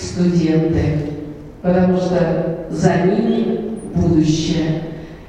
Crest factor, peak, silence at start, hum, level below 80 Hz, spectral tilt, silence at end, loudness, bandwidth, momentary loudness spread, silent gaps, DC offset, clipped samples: 16 dB; -2 dBFS; 0 s; none; -36 dBFS; -7 dB/octave; 0 s; -17 LUFS; 10 kHz; 9 LU; none; under 0.1%; under 0.1%